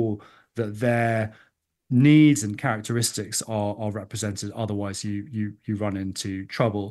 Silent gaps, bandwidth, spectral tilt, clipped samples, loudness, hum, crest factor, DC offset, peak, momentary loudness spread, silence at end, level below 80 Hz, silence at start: none; 12.5 kHz; -5.5 dB/octave; under 0.1%; -24 LUFS; none; 18 dB; under 0.1%; -6 dBFS; 14 LU; 0 s; -64 dBFS; 0 s